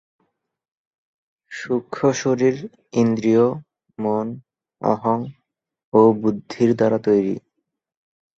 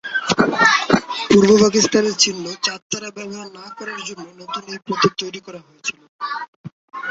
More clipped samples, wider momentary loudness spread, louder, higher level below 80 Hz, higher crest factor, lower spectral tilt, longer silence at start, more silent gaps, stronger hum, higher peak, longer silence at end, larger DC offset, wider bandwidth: neither; second, 15 LU vs 20 LU; second, -20 LUFS vs -17 LUFS; second, -62 dBFS vs -54 dBFS; about the same, 20 dB vs 20 dB; first, -7 dB/octave vs -3.5 dB/octave; first, 1.5 s vs 0.05 s; second, 5.84-5.92 s vs 2.82-2.90 s, 6.09-6.19 s, 6.48-6.64 s, 6.72-6.88 s; neither; about the same, -2 dBFS vs 0 dBFS; first, 1 s vs 0 s; neither; about the same, 7.8 kHz vs 8 kHz